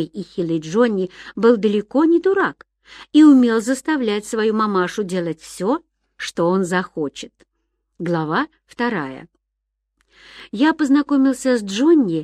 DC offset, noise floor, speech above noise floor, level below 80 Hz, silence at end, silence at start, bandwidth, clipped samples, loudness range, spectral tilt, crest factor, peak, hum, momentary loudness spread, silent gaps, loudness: under 0.1%; -77 dBFS; 59 dB; -60 dBFS; 0 s; 0 s; 12.5 kHz; under 0.1%; 9 LU; -5.5 dB/octave; 16 dB; -2 dBFS; none; 13 LU; none; -18 LUFS